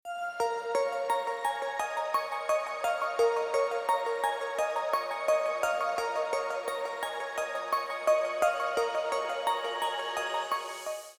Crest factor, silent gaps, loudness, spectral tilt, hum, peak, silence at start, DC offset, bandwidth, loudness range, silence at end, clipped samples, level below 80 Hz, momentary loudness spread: 18 dB; none; -31 LUFS; -0.5 dB/octave; none; -14 dBFS; 0.05 s; under 0.1%; 19.5 kHz; 2 LU; 0.05 s; under 0.1%; -72 dBFS; 6 LU